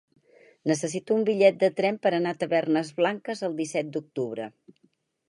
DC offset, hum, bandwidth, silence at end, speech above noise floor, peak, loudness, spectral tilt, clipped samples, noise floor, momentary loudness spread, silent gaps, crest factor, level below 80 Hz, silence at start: under 0.1%; none; 11.5 kHz; 0.8 s; 43 dB; -6 dBFS; -26 LUFS; -5 dB/octave; under 0.1%; -68 dBFS; 12 LU; none; 22 dB; -78 dBFS; 0.65 s